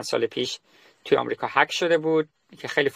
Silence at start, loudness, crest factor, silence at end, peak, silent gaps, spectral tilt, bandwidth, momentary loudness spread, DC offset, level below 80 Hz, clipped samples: 0 s; -24 LUFS; 20 dB; 0.05 s; -4 dBFS; none; -4 dB/octave; 15 kHz; 15 LU; under 0.1%; -70 dBFS; under 0.1%